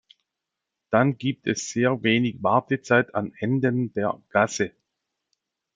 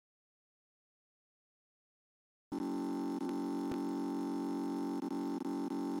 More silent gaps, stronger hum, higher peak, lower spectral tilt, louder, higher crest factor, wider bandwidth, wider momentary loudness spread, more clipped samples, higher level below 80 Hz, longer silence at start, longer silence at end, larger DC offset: neither; neither; first, -4 dBFS vs -26 dBFS; about the same, -5.5 dB/octave vs -6.5 dB/octave; first, -24 LUFS vs -39 LUFS; first, 22 dB vs 14 dB; second, 9.4 kHz vs 16 kHz; first, 7 LU vs 1 LU; neither; first, -66 dBFS vs -76 dBFS; second, 0.9 s vs 2.5 s; first, 1.05 s vs 0 s; neither